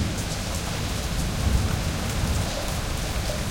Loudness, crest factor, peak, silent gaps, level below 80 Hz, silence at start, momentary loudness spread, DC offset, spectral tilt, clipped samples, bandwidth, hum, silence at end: -27 LUFS; 18 dB; -8 dBFS; none; -30 dBFS; 0 s; 4 LU; under 0.1%; -4.5 dB/octave; under 0.1%; 17 kHz; none; 0 s